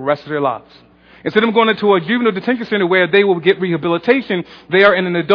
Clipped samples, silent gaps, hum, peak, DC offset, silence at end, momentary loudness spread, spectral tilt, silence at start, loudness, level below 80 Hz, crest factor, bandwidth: under 0.1%; none; none; 0 dBFS; under 0.1%; 0 s; 8 LU; -8 dB/octave; 0 s; -15 LUFS; -58 dBFS; 14 dB; 5.4 kHz